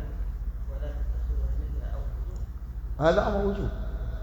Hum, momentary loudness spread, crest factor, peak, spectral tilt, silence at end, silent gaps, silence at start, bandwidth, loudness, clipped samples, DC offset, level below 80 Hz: none; 13 LU; 20 dB; -8 dBFS; -7.5 dB/octave; 0 s; none; 0 s; 7.4 kHz; -31 LUFS; under 0.1%; under 0.1%; -32 dBFS